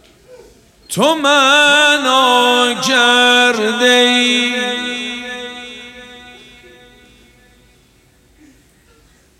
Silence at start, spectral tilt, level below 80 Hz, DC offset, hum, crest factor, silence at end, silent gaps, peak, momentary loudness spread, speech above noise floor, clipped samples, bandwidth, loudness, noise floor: 0.3 s; -1.5 dB/octave; -56 dBFS; under 0.1%; none; 16 dB; 3.1 s; none; 0 dBFS; 18 LU; 39 dB; under 0.1%; 16 kHz; -11 LUFS; -51 dBFS